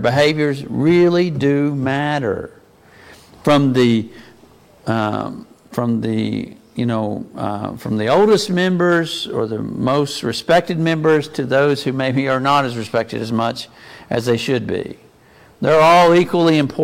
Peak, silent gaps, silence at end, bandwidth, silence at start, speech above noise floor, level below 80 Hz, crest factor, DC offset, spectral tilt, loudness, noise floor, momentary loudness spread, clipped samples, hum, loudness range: -2 dBFS; none; 0 s; 16 kHz; 0 s; 31 dB; -52 dBFS; 16 dB; under 0.1%; -6 dB/octave; -17 LUFS; -48 dBFS; 12 LU; under 0.1%; none; 5 LU